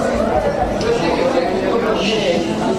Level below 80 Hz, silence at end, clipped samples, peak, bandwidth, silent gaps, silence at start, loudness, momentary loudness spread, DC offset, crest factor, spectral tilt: -34 dBFS; 0 s; under 0.1%; -4 dBFS; 15 kHz; none; 0 s; -17 LUFS; 2 LU; under 0.1%; 12 dB; -5 dB/octave